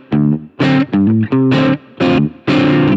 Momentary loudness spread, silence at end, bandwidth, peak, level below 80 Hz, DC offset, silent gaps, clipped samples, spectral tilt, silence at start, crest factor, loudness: 4 LU; 0 s; 7.6 kHz; 0 dBFS; -46 dBFS; under 0.1%; none; under 0.1%; -8 dB/octave; 0.1 s; 12 dB; -13 LUFS